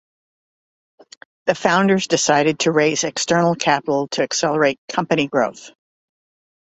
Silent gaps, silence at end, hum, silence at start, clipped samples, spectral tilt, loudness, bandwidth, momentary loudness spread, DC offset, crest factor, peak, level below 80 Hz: 4.78-4.88 s; 1 s; none; 1.45 s; under 0.1%; -4 dB/octave; -18 LUFS; 8.2 kHz; 5 LU; under 0.1%; 18 dB; -2 dBFS; -60 dBFS